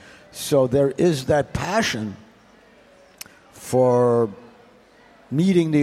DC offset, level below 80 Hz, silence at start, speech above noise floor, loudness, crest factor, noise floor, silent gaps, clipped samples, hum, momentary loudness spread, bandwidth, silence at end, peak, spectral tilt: under 0.1%; -50 dBFS; 0.35 s; 33 dB; -20 LUFS; 16 dB; -52 dBFS; none; under 0.1%; none; 22 LU; 15.5 kHz; 0 s; -6 dBFS; -6 dB/octave